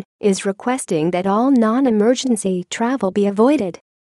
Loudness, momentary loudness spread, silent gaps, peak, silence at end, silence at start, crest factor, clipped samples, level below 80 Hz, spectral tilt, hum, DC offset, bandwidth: -18 LUFS; 6 LU; none; -4 dBFS; 0.4 s; 0.25 s; 14 dB; under 0.1%; -62 dBFS; -5.5 dB/octave; none; under 0.1%; 12.5 kHz